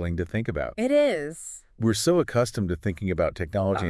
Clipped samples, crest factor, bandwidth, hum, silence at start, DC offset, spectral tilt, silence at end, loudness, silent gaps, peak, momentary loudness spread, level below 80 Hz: under 0.1%; 14 dB; 12 kHz; none; 0 s; under 0.1%; -5.5 dB/octave; 0 s; -25 LUFS; none; -10 dBFS; 9 LU; -48 dBFS